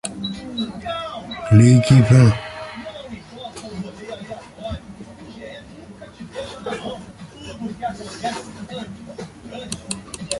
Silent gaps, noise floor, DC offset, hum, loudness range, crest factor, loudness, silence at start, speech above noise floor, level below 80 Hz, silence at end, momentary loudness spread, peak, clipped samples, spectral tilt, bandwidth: none; -40 dBFS; under 0.1%; none; 17 LU; 20 dB; -19 LUFS; 0.05 s; 27 dB; -44 dBFS; 0 s; 25 LU; -2 dBFS; under 0.1%; -6.5 dB/octave; 11.5 kHz